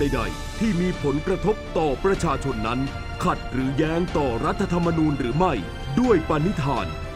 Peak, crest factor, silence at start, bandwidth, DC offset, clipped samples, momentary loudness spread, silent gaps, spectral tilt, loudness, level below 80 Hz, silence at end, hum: -6 dBFS; 18 dB; 0 s; 15 kHz; under 0.1%; under 0.1%; 6 LU; none; -6.5 dB/octave; -24 LUFS; -34 dBFS; 0 s; none